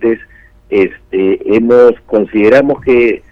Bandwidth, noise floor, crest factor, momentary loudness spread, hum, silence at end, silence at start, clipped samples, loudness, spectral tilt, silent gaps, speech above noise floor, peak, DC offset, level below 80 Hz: 6.6 kHz; -39 dBFS; 10 dB; 8 LU; none; 0.15 s; 0 s; under 0.1%; -10 LUFS; -7.5 dB/octave; none; 30 dB; 0 dBFS; under 0.1%; -42 dBFS